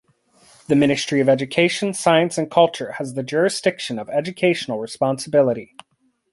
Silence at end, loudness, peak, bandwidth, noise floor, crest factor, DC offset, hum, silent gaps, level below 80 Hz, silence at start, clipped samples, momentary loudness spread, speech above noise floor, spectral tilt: 0.7 s; -20 LUFS; -2 dBFS; 11.5 kHz; -66 dBFS; 18 dB; under 0.1%; none; none; -62 dBFS; 0.7 s; under 0.1%; 10 LU; 47 dB; -5 dB/octave